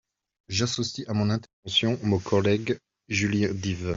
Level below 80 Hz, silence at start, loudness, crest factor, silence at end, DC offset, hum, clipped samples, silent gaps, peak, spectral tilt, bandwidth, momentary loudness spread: -58 dBFS; 0.5 s; -26 LUFS; 18 dB; 0 s; under 0.1%; none; under 0.1%; 1.53-1.63 s; -8 dBFS; -5 dB/octave; 7.8 kHz; 7 LU